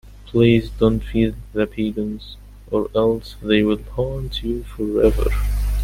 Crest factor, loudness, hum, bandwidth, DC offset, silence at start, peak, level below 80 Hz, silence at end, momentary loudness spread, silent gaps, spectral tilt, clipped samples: 18 dB; -20 LUFS; 50 Hz at -35 dBFS; 16 kHz; under 0.1%; 0.05 s; -2 dBFS; -28 dBFS; 0 s; 9 LU; none; -7.5 dB/octave; under 0.1%